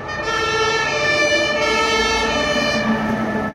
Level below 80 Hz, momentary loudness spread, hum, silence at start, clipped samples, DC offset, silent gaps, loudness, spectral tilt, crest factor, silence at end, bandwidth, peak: -40 dBFS; 4 LU; none; 0 s; under 0.1%; under 0.1%; none; -17 LUFS; -3 dB/octave; 14 dB; 0 s; 16 kHz; -6 dBFS